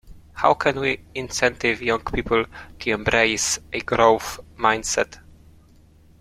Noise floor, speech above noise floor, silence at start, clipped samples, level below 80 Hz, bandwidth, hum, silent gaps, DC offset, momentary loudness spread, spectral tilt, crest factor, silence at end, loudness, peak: -52 dBFS; 30 dB; 0.1 s; under 0.1%; -44 dBFS; 16 kHz; none; none; under 0.1%; 10 LU; -3 dB/octave; 22 dB; 1.05 s; -21 LUFS; -2 dBFS